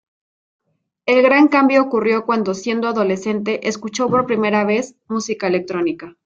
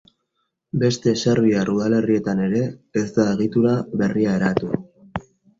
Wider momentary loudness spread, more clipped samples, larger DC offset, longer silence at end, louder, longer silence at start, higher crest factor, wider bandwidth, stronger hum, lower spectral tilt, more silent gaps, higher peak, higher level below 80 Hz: about the same, 11 LU vs 11 LU; neither; neither; second, 0.15 s vs 0.4 s; first, -17 LUFS vs -20 LUFS; first, 1.05 s vs 0.75 s; about the same, 16 dB vs 18 dB; about the same, 7.8 kHz vs 7.8 kHz; neither; second, -5 dB/octave vs -6.5 dB/octave; neither; about the same, -2 dBFS vs -4 dBFS; second, -62 dBFS vs -52 dBFS